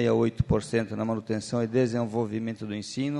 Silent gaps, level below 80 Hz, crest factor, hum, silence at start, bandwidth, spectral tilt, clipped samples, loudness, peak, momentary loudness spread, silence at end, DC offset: none; -46 dBFS; 16 dB; none; 0 s; 11 kHz; -6.5 dB/octave; under 0.1%; -28 LUFS; -10 dBFS; 7 LU; 0 s; under 0.1%